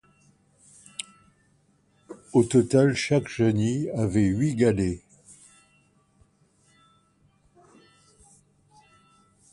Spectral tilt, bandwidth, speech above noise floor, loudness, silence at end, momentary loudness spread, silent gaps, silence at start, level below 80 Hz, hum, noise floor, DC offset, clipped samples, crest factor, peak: -6.5 dB/octave; 11.5 kHz; 42 dB; -23 LUFS; 4.55 s; 18 LU; none; 2.1 s; -52 dBFS; none; -65 dBFS; under 0.1%; under 0.1%; 20 dB; -8 dBFS